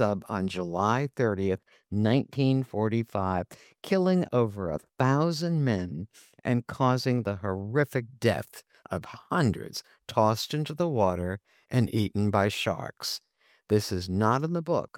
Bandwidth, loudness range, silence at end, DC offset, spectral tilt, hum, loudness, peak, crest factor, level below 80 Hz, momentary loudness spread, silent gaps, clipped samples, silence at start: 17 kHz; 2 LU; 0.1 s; under 0.1%; -6.5 dB/octave; none; -28 LUFS; -8 dBFS; 20 dB; -60 dBFS; 11 LU; none; under 0.1%; 0 s